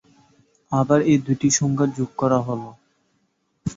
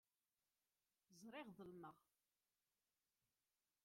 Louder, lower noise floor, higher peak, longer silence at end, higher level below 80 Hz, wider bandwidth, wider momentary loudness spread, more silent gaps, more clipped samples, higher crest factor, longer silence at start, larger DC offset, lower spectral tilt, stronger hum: first, -20 LUFS vs -60 LUFS; second, -69 dBFS vs under -90 dBFS; first, -4 dBFS vs -46 dBFS; second, 0.05 s vs 1.85 s; first, -54 dBFS vs under -90 dBFS; second, 8 kHz vs 16 kHz; first, 13 LU vs 6 LU; neither; neither; about the same, 20 dB vs 20 dB; second, 0.7 s vs 1.1 s; neither; about the same, -5.5 dB/octave vs -5 dB/octave; neither